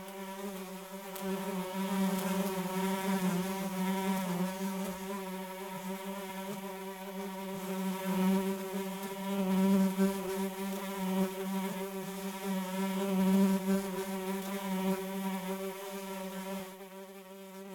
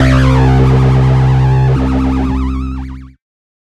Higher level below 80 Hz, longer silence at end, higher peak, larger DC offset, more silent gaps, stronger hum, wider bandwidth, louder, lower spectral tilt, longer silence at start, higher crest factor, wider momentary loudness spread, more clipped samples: second, -70 dBFS vs -18 dBFS; second, 0 s vs 0.55 s; second, -18 dBFS vs 0 dBFS; neither; neither; neither; first, 17.5 kHz vs 8 kHz; second, -35 LUFS vs -11 LUFS; second, -6 dB/octave vs -8 dB/octave; about the same, 0 s vs 0 s; first, 18 dB vs 10 dB; about the same, 12 LU vs 11 LU; neither